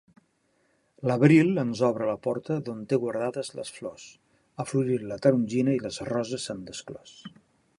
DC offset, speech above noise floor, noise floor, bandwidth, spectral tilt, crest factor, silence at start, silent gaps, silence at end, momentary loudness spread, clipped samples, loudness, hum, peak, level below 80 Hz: under 0.1%; 43 dB; -70 dBFS; 11.5 kHz; -6.5 dB/octave; 22 dB; 1 s; none; 0.5 s; 19 LU; under 0.1%; -26 LUFS; none; -6 dBFS; -66 dBFS